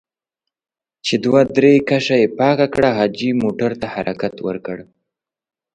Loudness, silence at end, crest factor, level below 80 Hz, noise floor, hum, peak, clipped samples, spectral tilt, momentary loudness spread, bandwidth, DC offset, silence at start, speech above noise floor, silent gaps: -17 LUFS; 0.9 s; 18 dB; -54 dBFS; -89 dBFS; none; 0 dBFS; under 0.1%; -6 dB/octave; 13 LU; 9.2 kHz; under 0.1%; 1.05 s; 73 dB; none